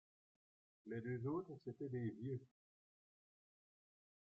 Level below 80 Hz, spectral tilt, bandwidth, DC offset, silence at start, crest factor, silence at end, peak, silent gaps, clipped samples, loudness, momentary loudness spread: -86 dBFS; -9.5 dB/octave; 5.4 kHz; under 0.1%; 0.85 s; 18 dB; 1.75 s; -34 dBFS; none; under 0.1%; -48 LUFS; 7 LU